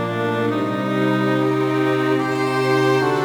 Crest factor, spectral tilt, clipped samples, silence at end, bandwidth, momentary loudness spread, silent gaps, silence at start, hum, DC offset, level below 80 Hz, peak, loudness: 12 dB; -6.5 dB/octave; under 0.1%; 0 s; over 20 kHz; 4 LU; none; 0 s; none; under 0.1%; -64 dBFS; -6 dBFS; -19 LUFS